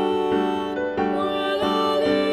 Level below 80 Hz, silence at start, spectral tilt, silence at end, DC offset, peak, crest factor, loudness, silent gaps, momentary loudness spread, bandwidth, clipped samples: -52 dBFS; 0 s; -5.5 dB/octave; 0 s; under 0.1%; -8 dBFS; 14 dB; -22 LUFS; none; 4 LU; 13.5 kHz; under 0.1%